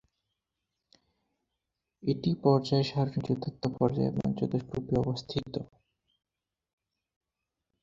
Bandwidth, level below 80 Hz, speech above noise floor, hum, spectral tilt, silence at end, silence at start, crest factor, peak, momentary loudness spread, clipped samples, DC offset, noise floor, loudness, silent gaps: 7.6 kHz; -58 dBFS; 57 dB; none; -8 dB/octave; 2.2 s; 2.05 s; 22 dB; -10 dBFS; 9 LU; under 0.1%; under 0.1%; -87 dBFS; -30 LUFS; none